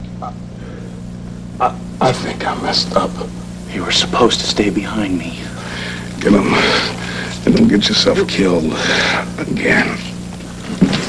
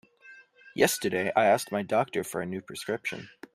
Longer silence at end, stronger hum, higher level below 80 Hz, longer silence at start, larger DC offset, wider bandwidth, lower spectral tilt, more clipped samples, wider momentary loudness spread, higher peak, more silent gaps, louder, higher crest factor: second, 0 s vs 0.25 s; first, 60 Hz at -40 dBFS vs none; first, -36 dBFS vs -70 dBFS; second, 0 s vs 0.25 s; neither; second, 11 kHz vs 15.5 kHz; about the same, -4.5 dB/octave vs -4 dB/octave; neither; first, 17 LU vs 12 LU; first, 0 dBFS vs -6 dBFS; neither; first, -15 LUFS vs -28 LUFS; second, 16 dB vs 22 dB